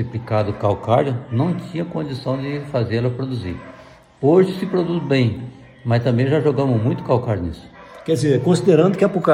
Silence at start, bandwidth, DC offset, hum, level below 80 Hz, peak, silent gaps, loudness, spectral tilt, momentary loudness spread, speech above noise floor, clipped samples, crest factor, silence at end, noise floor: 0 s; 11.5 kHz; under 0.1%; none; -48 dBFS; -2 dBFS; none; -19 LUFS; -7.5 dB/octave; 12 LU; 26 dB; under 0.1%; 18 dB; 0 s; -44 dBFS